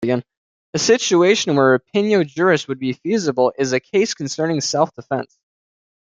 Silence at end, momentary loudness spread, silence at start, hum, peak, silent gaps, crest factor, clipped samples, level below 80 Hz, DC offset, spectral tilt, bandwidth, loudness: 0.9 s; 10 LU; 0 s; none; -2 dBFS; 0.37-0.73 s; 16 dB; under 0.1%; -64 dBFS; under 0.1%; -4.5 dB/octave; 9.4 kHz; -18 LUFS